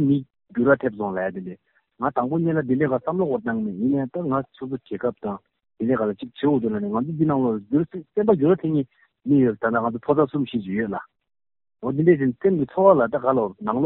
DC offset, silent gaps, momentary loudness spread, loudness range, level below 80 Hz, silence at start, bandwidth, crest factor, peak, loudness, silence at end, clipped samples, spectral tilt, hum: under 0.1%; none; 11 LU; 4 LU; -60 dBFS; 0 s; 4.1 kHz; 18 dB; -4 dBFS; -23 LUFS; 0 s; under 0.1%; -8 dB/octave; none